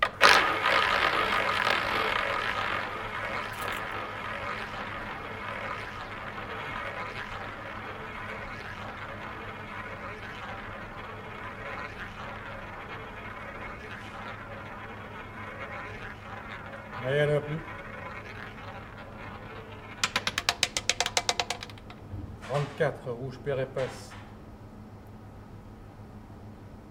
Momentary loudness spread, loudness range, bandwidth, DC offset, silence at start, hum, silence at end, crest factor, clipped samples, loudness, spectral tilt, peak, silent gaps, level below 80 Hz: 18 LU; 11 LU; 17 kHz; under 0.1%; 0 s; none; 0 s; 32 dB; under 0.1%; -31 LUFS; -3 dB/octave; 0 dBFS; none; -52 dBFS